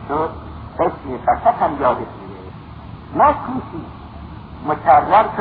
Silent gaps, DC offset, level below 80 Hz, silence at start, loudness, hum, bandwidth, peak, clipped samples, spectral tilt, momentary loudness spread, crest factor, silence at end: none; under 0.1%; -40 dBFS; 0 s; -17 LUFS; none; 4.9 kHz; 0 dBFS; under 0.1%; -10.5 dB/octave; 22 LU; 18 dB; 0 s